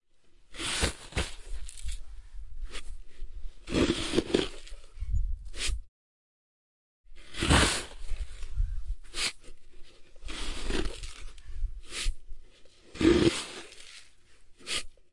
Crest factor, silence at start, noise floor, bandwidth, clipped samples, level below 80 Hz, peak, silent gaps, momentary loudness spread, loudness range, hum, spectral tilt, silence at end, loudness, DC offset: 22 dB; 0.1 s; -57 dBFS; 11.5 kHz; under 0.1%; -38 dBFS; -10 dBFS; 5.88-7.04 s; 23 LU; 7 LU; none; -4 dB/octave; 0.15 s; -31 LUFS; 0.1%